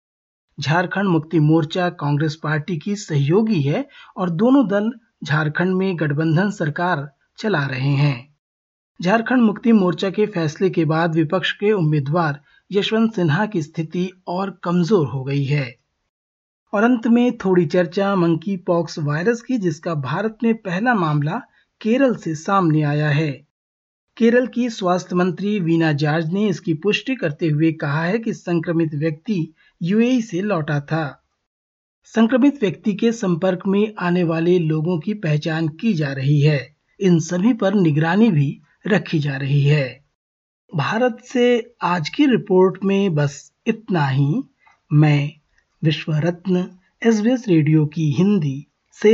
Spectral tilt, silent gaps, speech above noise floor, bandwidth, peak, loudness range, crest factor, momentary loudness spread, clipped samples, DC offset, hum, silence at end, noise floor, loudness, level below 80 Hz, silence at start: -7 dB/octave; 8.39-8.95 s, 16.09-16.66 s, 23.51-24.08 s, 31.46-32.02 s, 40.15-40.68 s; over 72 dB; 7.6 kHz; -4 dBFS; 3 LU; 16 dB; 9 LU; under 0.1%; under 0.1%; none; 0 s; under -90 dBFS; -19 LUFS; -64 dBFS; 0.6 s